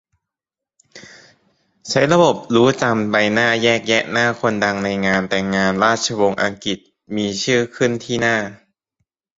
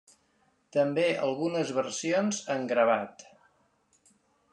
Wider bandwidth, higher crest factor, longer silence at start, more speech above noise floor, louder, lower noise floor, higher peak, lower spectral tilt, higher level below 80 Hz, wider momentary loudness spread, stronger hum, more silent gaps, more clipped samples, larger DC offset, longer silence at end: second, 8 kHz vs 10.5 kHz; about the same, 18 dB vs 20 dB; first, 0.95 s vs 0.75 s; first, 70 dB vs 42 dB; first, -17 LUFS vs -28 LUFS; first, -87 dBFS vs -70 dBFS; first, -2 dBFS vs -12 dBFS; about the same, -4.5 dB/octave vs -4.5 dB/octave; first, -54 dBFS vs -78 dBFS; about the same, 8 LU vs 6 LU; neither; neither; neither; neither; second, 0.8 s vs 1.3 s